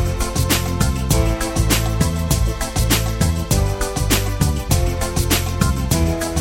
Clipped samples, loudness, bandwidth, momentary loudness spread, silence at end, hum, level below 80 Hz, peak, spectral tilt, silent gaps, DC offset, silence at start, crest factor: under 0.1%; -19 LUFS; 17 kHz; 3 LU; 0 s; none; -24 dBFS; 0 dBFS; -4.5 dB/octave; none; under 0.1%; 0 s; 16 dB